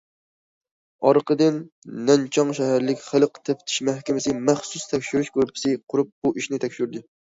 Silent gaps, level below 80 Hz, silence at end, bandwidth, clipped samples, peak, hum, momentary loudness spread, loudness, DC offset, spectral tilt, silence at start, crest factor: 1.72-1.82 s, 6.12-6.22 s; -64 dBFS; 0.2 s; 8 kHz; under 0.1%; -4 dBFS; none; 8 LU; -23 LUFS; under 0.1%; -5 dB/octave; 1 s; 20 dB